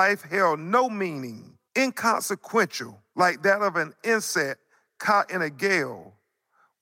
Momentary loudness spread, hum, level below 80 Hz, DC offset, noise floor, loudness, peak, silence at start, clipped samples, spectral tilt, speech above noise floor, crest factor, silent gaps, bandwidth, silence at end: 13 LU; none; -84 dBFS; under 0.1%; -67 dBFS; -24 LUFS; -8 dBFS; 0 s; under 0.1%; -3.5 dB/octave; 42 dB; 18 dB; none; 16.5 kHz; 0.75 s